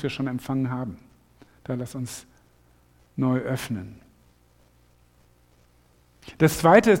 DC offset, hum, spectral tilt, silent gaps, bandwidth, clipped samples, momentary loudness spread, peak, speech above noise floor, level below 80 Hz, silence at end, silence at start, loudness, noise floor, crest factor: under 0.1%; 60 Hz at -60 dBFS; -6 dB/octave; none; 17 kHz; under 0.1%; 25 LU; -2 dBFS; 37 dB; -54 dBFS; 0 s; 0 s; -24 LUFS; -60 dBFS; 24 dB